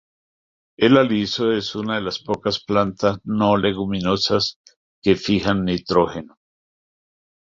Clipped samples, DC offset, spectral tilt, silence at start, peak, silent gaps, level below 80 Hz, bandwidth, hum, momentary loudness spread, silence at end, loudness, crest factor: under 0.1%; under 0.1%; -6 dB/octave; 0.8 s; -2 dBFS; 4.56-4.64 s, 4.76-5.02 s; -48 dBFS; 7.6 kHz; none; 8 LU; 1.2 s; -20 LUFS; 20 dB